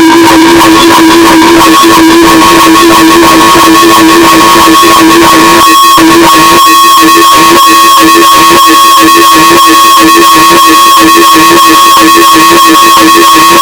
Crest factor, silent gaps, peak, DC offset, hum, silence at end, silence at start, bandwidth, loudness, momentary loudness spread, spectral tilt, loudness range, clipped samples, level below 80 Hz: 0 dB; none; 0 dBFS; under 0.1%; none; 0 s; 0 s; over 20 kHz; 0 LUFS; 1 LU; -2 dB/octave; 0 LU; 40%; -30 dBFS